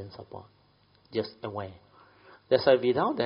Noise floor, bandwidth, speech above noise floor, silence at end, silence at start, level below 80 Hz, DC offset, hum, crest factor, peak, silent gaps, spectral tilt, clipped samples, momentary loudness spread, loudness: -63 dBFS; 5.4 kHz; 36 dB; 0 s; 0 s; -68 dBFS; under 0.1%; none; 22 dB; -8 dBFS; none; -4 dB/octave; under 0.1%; 22 LU; -27 LUFS